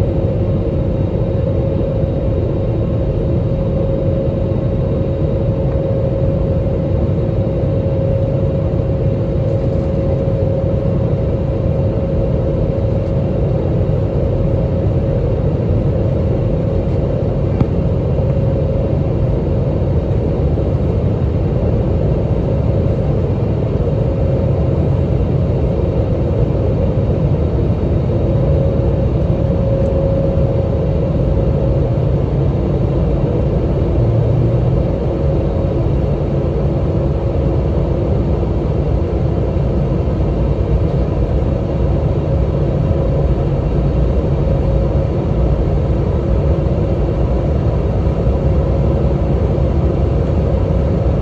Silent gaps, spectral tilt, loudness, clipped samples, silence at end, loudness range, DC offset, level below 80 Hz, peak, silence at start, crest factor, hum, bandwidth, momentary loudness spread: none; -10.5 dB/octave; -16 LUFS; under 0.1%; 0 s; 1 LU; under 0.1%; -20 dBFS; -2 dBFS; 0 s; 12 dB; none; 6.4 kHz; 2 LU